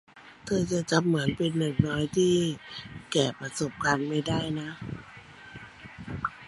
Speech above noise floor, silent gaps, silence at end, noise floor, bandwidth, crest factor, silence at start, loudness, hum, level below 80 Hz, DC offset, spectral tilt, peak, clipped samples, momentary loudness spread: 21 dB; none; 0 s; -48 dBFS; 11.5 kHz; 22 dB; 0.15 s; -28 LUFS; none; -54 dBFS; under 0.1%; -5 dB/octave; -8 dBFS; under 0.1%; 20 LU